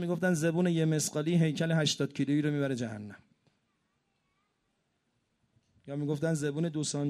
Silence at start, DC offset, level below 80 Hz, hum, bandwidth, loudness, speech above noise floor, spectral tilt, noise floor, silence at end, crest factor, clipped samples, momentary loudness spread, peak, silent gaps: 0 s; under 0.1%; -72 dBFS; none; 13 kHz; -30 LUFS; 48 dB; -5.5 dB/octave; -78 dBFS; 0 s; 16 dB; under 0.1%; 9 LU; -16 dBFS; none